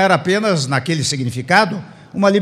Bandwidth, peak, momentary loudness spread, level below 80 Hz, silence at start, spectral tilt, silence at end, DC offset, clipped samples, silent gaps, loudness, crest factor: 14 kHz; 0 dBFS; 7 LU; -58 dBFS; 0 s; -4.5 dB/octave; 0 s; under 0.1%; under 0.1%; none; -16 LUFS; 16 dB